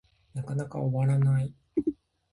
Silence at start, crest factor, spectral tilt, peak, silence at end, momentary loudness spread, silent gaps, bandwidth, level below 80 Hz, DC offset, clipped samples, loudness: 0.35 s; 14 dB; -9.5 dB/octave; -16 dBFS; 0.4 s; 11 LU; none; 11 kHz; -58 dBFS; under 0.1%; under 0.1%; -29 LUFS